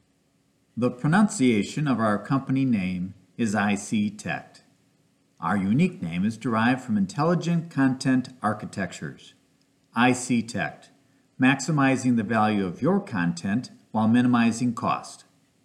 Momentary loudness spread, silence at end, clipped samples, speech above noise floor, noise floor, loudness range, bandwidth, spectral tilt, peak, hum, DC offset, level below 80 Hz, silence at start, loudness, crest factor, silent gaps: 11 LU; 0.5 s; under 0.1%; 43 dB; -66 dBFS; 4 LU; 11.5 kHz; -6 dB/octave; -8 dBFS; none; under 0.1%; -68 dBFS; 0.75 s; -25 LUFS; 18 dB; none